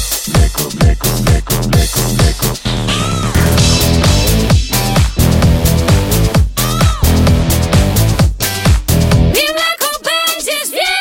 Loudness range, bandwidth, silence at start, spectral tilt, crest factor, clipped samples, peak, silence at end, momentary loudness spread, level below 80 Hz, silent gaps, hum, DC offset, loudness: 1 LU; 17 kHz; 0 s; -4.5 dB/octave; 12 dB; under 0.1%; 0 dBFS; 0 s; 4 LU; -18 dBFS; none; none; under 0.1%; -12 LUFS